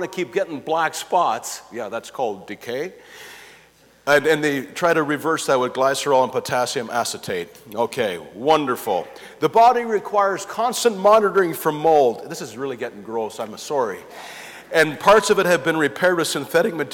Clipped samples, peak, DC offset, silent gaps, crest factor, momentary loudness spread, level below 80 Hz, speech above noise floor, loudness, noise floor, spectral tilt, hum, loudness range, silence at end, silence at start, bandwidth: under 0.1%; -6 dBFS; under 0.1%; none; 16 dB; 15 LU; -62 dBFS; 32 dB; -20 LUFS; -52 dBFS; -3.5 dB/octave; none; 6 LU; 0 s; 0 s; 18.5 kHz